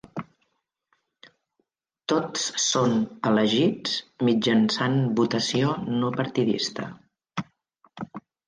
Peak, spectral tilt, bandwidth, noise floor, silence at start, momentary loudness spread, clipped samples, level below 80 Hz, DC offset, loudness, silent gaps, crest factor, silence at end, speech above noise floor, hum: -8 dBFS; -4.5 dB/octave; 10 kHz; -76 dBFS; 0.15 s; 17 LU; under 0.1%; -66 dBFS; under 0.1%; -24 LUFS; none; 18 dB; 0.3 s; 52 dB; none